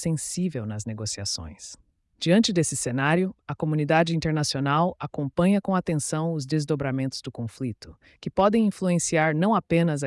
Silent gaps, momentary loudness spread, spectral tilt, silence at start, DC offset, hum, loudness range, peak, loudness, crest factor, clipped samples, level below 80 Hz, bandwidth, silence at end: none; 11 LU; -5 dB/octave; 0 s; under 0.1%; none; 3 LU; -10 dBFS; -25 LUFS; 16 dB; under 0.1%; -56 dBFS; 12 kHz; 0 s